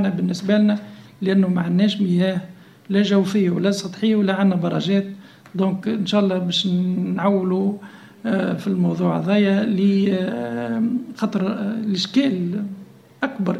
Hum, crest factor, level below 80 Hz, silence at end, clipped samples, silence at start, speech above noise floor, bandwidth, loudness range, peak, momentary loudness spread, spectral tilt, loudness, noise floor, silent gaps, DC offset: none; 14 dB; -64 dBFS; 0 s; under 0.1%; 0 s; 20 dB; 10 kHz; 2 LU; -6 dBFS; 9 LU; -7 dB/octave; -20 LUFS; -39 dBFS; none; under 0.1%